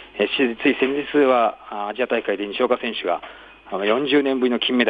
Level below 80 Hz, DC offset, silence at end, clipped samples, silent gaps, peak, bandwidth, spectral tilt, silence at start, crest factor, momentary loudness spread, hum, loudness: -60 dBFS; under 0.1%; 0 s; under 0.1%; none; -4 dBFS; 5 kHz; -6.5 dB/octave; 0 s; 16 dB; 10 LU; none; -21 LUFS